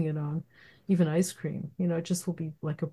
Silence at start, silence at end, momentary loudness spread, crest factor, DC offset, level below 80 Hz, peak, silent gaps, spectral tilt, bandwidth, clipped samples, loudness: 0 s; 0 s; 10 LU; 16 dB; under 0.1%; -70 dBFS; -14 dBFS; none; -6.5 dB/octave; 12.5 kHz; under 0.1%; -31 LUFS